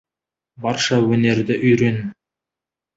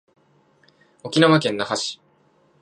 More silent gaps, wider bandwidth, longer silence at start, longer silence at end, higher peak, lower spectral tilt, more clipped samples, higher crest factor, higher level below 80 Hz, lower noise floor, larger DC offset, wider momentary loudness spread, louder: neither; second, 8 kHz vs 11 kHz; second, 0.6 s vs 1.05 s; first, 0.85 s vs 0.7 s; about the same, -4 dBFS vs -2 dBFS; about the same, -5.5 dB/octave vs -5 dB/octave; neither; second, 16 dB vs 22 dB; first, -54 dBFS vs -68 dBFS; first, -88 dBFS vs -60 dBFS; neither; second, 11 LU vs 21 LU; about the same, -18 LUFS vs -20 LUFS